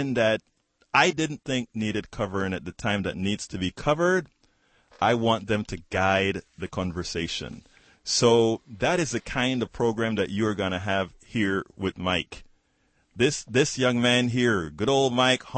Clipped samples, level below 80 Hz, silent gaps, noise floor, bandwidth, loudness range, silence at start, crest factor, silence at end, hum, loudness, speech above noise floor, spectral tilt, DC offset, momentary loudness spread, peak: under 0.1%; -52 dBFS; none; -68 dBFS; 8.8 kHz; 3 LU; 0 s; 20 dB; 0 s; none; -25 LUFS; 43 dB; -4.5 dB/octave; under 0.1%; 9 LU; -6 dBFS